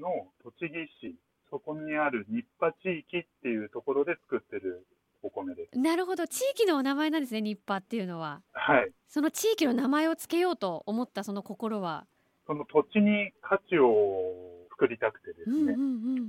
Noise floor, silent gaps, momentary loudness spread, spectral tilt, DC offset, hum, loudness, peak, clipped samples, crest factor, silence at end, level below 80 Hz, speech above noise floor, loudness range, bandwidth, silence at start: -54 dBFS; none; 13 LU; -5 dB/octave; under 0.1%; none; -30 LUFS; -10 dBFS; under 0.1%; 20 dB; 0 s; -74 dBFS; 25 dB; 6 LU; 16.5 kHz; 0 s